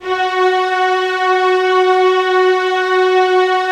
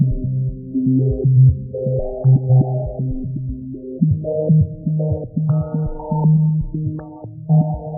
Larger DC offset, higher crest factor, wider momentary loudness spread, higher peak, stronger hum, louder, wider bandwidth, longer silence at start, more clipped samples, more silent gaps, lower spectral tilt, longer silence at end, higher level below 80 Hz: neither; about the same, 12 dB vs 14 dB; second, 3 LU vs 12 LU; about the same, -2 dBFS vs -4 dBFS; neither; first, -13 LUFS vs -18 LUFS; first, 9.4 kHz vs 1.5 kHz; about the same, 0 s vs 0 s; neither; neither; second, -2 dB/octave vs -18.5 dB/octave; about the same, 0 s vs 0 s; second, -60 dBFS vs -34 dBFS